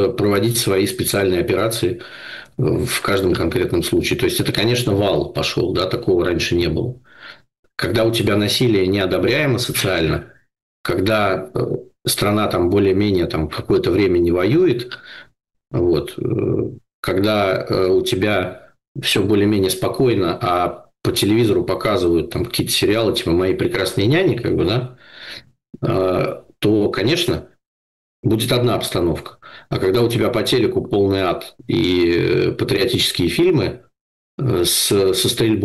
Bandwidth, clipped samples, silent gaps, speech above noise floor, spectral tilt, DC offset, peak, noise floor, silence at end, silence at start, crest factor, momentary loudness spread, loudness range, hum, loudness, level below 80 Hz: 13 kHz; under 0.1%; 7.59-7.63 s, 10.62-10.84 s, 16.94-17.03 s, 18.88-18.95 s, 27.67-28.23 s, 34.01-34.38 s; 24 dB; -5 dB/octave; 0.2%; -8 dBFS; -42 dBFS; 0 s; 0 s; 10 dB; 9 LU; 3 LU; none; -18 LUFS; -42 dBFS